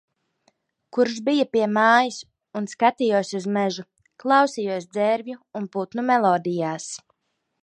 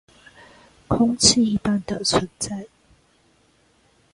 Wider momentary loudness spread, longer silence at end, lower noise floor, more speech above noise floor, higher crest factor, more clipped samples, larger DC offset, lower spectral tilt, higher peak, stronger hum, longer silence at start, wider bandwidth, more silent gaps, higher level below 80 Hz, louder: about the same, 14 LU vs 14 LU; second, 0.65 s vs 1.5 s; first, -76 dBFS vs -60 dBFS; first, 54 dB vs 40 dB; about the same, 20 dB vs 22 dB; neither; neither; about the same, -4.5 dB/octave vs -3.5 dB/octave; about the same, -4 dBFS vs -2 dBFS; neither; about the same, 0.95 s vs 0.9 s; about the same, 11 kHz vs 11.5 kHz; neither; second, -76 dBFS vs -46 dBFS; about the same, -22 LUFS vs -20 LUFS